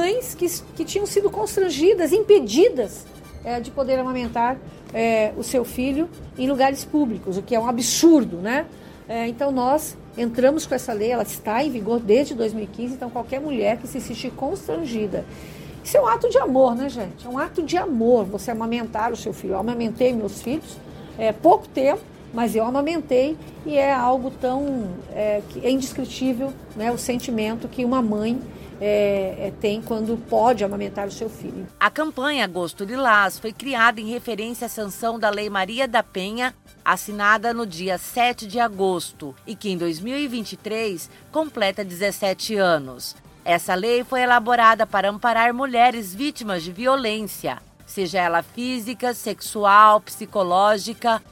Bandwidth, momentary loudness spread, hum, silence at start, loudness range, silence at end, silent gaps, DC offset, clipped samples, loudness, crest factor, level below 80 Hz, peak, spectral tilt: 17 kHz; 12 LU; none; 0 s; 5 LU; 0.1 s; none; under 0.1%; under 0.1%; -22 LUFS; 20 dB; -50 dBFS; 0 dBFS; -4 dB/octave